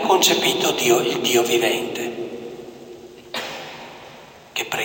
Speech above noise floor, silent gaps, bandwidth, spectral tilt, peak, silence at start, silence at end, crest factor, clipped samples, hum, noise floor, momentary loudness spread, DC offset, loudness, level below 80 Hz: 24 dB; none; 17 kHz; -2 dB/octave; -4 dBFS; 0 s; 0 s; 18 dB; under 0.1%; none; -43 dBFS; 24 LU; under 0.1%; -20 LUFS; -64 dBFS